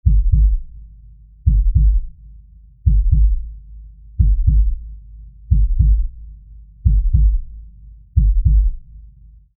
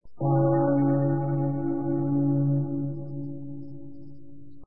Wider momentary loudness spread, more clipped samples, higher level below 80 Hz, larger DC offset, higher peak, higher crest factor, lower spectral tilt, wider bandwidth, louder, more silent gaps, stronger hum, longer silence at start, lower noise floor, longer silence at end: first, 20 LU vs 17 LU; neither; first, -16 dBFS vs -58 dBFS; second, under 0.1% vs 1%; first, -2 dBFS vs -12 dBFS; about the same, 14 dB vs 14 dB; first, -22.5 dB/octave vs -15.5 dB/octave; second, 0.4 kHz vs 2.3 kHz; first, -18 LUFS vs -26 LUFS; neither; neither; about the same, 0.05 s vs 0 s; second, -44 dBFS vs -49 dBFS; first, 0.55 s vs 0 s